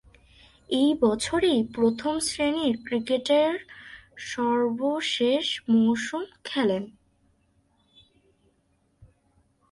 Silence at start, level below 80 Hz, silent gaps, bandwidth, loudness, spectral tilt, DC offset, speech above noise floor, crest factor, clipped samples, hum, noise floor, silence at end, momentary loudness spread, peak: 0.7 s; -60 dBFS; none; 11.5 kHz; -25 LUFS; -4 dB/octave; under 0.1%; 44 dB; 18 dB; under 0.1%; none; -68 dBFS; 0.65 s; 13 LU; -10 dBFS